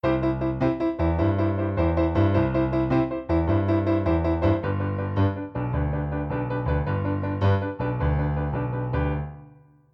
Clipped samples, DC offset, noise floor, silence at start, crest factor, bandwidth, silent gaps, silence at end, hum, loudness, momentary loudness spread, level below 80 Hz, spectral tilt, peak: under 0.1%; under 0.1%; -51 dBFS; 0.05 s; 14 dB; 5.8 kHz; none; 0.45 s; none; -25 LUFS; 5 LU; -34 dBFS; -10.5 dB/octave; -8 dBFS